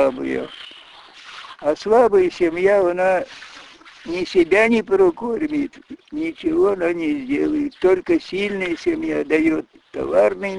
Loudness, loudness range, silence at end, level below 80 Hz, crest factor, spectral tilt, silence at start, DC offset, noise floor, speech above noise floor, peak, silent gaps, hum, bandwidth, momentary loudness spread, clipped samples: -19 LUFS; 3 LU; 0 s; -52 dBFS; 16 dB; -6 dB/octave; 0 s; under 0.1%; -43 dBFS; 25 dB; -4 dBFS; none; none; 11 kHz; 18 LU; under 0.1%